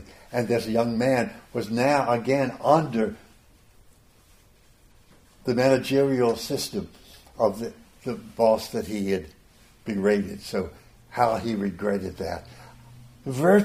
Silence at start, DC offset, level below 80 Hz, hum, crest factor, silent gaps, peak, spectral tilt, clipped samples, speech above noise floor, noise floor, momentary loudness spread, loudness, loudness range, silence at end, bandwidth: 0 s; under 0.1%; -56 dBFS; none; 22 dB; none; -4 dBFS; -6 dB/octave; under 0.1%; 32 dB; -56 dBFS; 14 LU; -25 LUFS; 4 LU; 0 s; 15.5 kHz